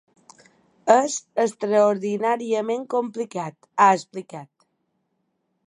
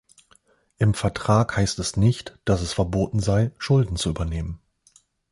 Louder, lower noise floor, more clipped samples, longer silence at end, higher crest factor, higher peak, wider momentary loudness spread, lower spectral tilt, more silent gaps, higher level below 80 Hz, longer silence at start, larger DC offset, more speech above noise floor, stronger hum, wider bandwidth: about the same, -22 LUFS vs -23 LUFS; first, -73 dBFS vs -60 dBFS; neither; first, 1.2 s vs 0.75 s; about the same, 22 dB vs 18 dB; first, -2 dBFS vs -6 dBFS; first, 15 LU vs 8 LU; second, -4.5 dB/octave vs -6 dB/octave; neither; second, -80 dBFS vs -38 dBFS; about the same, 0.85 s vs 0.8 s; neither; first, 52 dB vs 38 dB; neither; about the same, 11 kHz vs 11.5 kHz